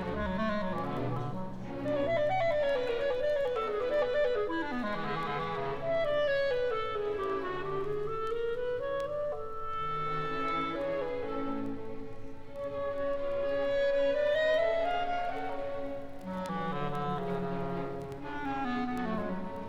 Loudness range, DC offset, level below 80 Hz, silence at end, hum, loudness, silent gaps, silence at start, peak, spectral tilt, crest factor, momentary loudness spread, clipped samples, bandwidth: 5 LU; under 0.1%; -50 dBFS; 0 s; none; -33 LUFS; none; 0 s; -18 dBFS; -7 dB/octave; 14 dB; 10 LU; under 0.1%; 9.2 kHz